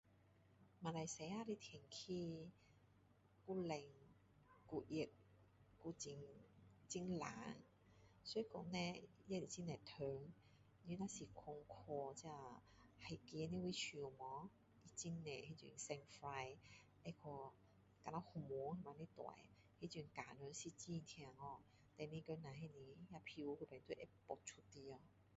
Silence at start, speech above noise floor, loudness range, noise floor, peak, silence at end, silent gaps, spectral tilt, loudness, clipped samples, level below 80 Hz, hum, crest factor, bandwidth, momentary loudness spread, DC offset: 0.05 s; 22 dB; 4 LU; -74 dBFS; -32 dBFS; 0 s; none; -5 dB/octave; -52 LUFS; under 0.1%; -78 dBFS; none; 22 dB; 7.6 kHz; 13 LU; under 0.1%